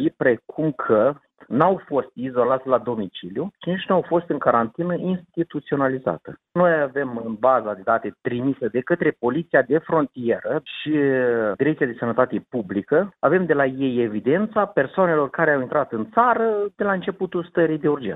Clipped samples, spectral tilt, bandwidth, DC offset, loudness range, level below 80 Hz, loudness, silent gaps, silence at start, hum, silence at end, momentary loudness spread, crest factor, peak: under 0.1%; -10 dB/octave; 4 kHz; under 0.1%; 2 LU; -62 dBFS; -22 LUFS; none; 0 s; none; 0 s; 8 LU; 18 dB; -4 dBFS